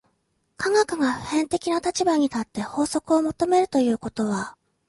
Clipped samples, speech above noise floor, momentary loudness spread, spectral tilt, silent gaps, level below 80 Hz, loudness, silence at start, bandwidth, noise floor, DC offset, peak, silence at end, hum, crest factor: under 0.1%; 48 dB; 8 LU; -4.5 dB/octave; none; -56 dBFS; -23 LUFS; 0.6 s; 11.5 kHz; -71 dBFS; under 0.1%; -8 dBFS; 0.35 s; none; 16 dB